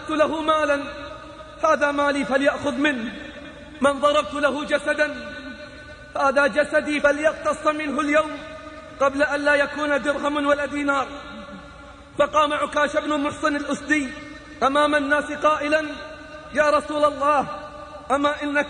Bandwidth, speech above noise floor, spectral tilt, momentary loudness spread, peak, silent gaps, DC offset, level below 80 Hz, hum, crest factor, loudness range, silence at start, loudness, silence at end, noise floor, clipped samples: 10 kHz; 21 dB; -4 dB/octave; 18 LU; -6 dBFS; none; under 0.1%; -50 dBFS; none; 16 dB; 2 LU; 0 s; -21 LUFS; 0 s; -42 dBFS; under 0.1%